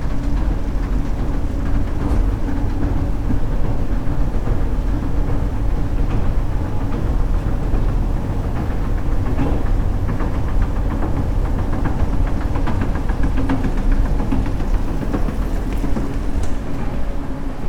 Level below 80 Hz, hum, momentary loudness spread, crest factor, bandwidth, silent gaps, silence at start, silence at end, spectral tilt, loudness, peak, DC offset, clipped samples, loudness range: -20 dBFS; none; 3 LU; 12 dB; 8.8 kHz; none; 0 s; 0 s; -8 dB/octave; -23 LUFS; -4 dBFS; under 0.1%; under 0.1%; 1 LU